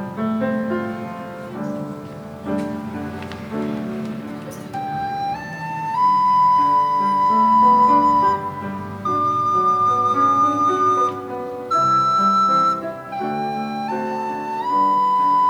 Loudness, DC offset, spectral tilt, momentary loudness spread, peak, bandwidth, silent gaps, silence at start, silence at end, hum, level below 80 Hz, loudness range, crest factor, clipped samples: -19 LUFS; under 0.1%; -6 dB/octave; 15 LU; -6 dBFS; 19 kHz; none; 0 s; 0 s; none; -56 dBFS; 12 LU; 14 dB; under 0.1%